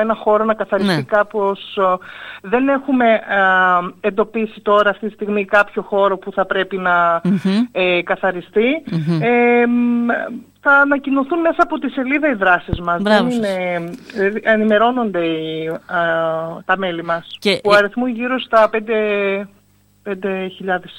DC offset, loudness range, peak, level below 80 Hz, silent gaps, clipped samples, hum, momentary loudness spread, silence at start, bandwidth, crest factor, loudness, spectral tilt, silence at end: under 0.1%; 2 LU; -2 dBFS; -48 dBFS; none; under 0.1%; none; 9 LU; 0 s; 16.5 kHz; 16 dB; -16 LUFS; -6.5 dB/octave; 0 s